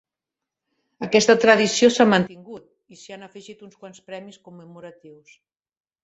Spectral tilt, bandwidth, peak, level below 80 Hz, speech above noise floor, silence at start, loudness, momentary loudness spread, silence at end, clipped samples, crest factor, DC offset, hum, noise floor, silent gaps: -4 dB/octave; 8.2 kHz; -2 dBFS; -64 dBFS; 66 dB; 1 s; -17 LUFS; 26 LU; 1.15 s; under 0.1%; 22 dB; under 0.1%; none; -87 dBFS; none